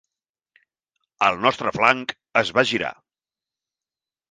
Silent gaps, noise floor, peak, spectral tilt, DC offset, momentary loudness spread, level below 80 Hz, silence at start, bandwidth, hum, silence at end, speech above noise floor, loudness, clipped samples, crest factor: none; under -90 dBFS; 0 dBFS; -4 dB/octave; under 0.1%; 6 LU; -62 dBFS; 1.2 s; 9.8 kHz; none; 1.4 s; over 69 dB; -21 LUFS; under 0.1%; 24 dB